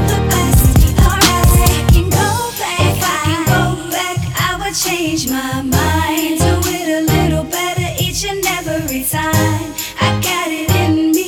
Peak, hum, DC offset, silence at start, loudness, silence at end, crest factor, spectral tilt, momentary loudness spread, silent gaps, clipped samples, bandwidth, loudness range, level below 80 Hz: 0 dBFS; none; under 0.1%; 0 s; -14 LUFS; 0 s; 14 dB; -4.5 dB/octave; 7 LU; none; under 0.1%; over 20 kHz; 4 LU; -22 dBFS